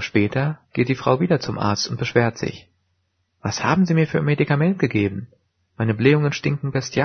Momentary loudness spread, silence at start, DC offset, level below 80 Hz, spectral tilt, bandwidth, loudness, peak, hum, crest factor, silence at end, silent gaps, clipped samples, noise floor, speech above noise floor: 8 LU; 0 s; under 0.1%; -54 dBFS; -6 dB/octave; 6.6 kHz; -21 LUFS; -2 dBFS; none; 20 dB; 0 s; none; under 0.1%; -70 dBFS; 50 dB